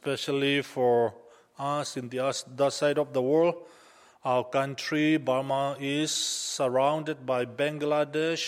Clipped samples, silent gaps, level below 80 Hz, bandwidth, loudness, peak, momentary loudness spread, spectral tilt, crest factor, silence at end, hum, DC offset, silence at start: under 0.1%; none; -76 dBFS; 16 kHz; -28 LUFS; -12 dBFS; 6 LU; -4 dB/octave; 16 dB; 0 s; none; under 0.1%; 0.05 s